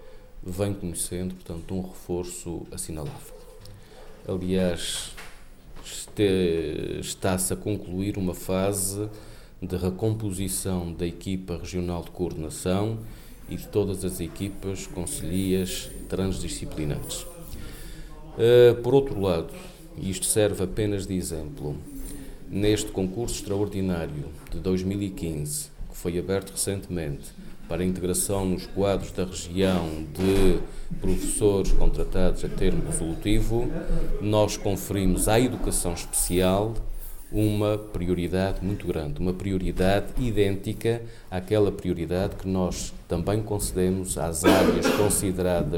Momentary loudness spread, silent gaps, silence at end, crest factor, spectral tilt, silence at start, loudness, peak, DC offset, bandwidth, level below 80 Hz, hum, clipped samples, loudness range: 15 LU; none; 0 s; 20 dB; -5 dB/octave; 0 s; -26 LUFS; -6 dBFS; under 0.1%; 18.5 kHz; -34 dBFS; none; under 0.1%; 7 LU